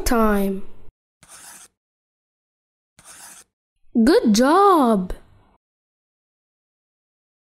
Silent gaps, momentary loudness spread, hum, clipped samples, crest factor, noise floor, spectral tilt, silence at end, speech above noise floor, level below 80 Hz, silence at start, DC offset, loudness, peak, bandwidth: 0.91-1.20 s, 1.77-2.96 s, 3.53-3.76 s; 26 LU; none; under 0.1%; 16 dB; -44 dBFS; -5 dB/octave; 2.4 s; 28 dB; -40 dBFS; 0 s; under 0.1%; -17 LUFS; -6 dBFS; 16 kHz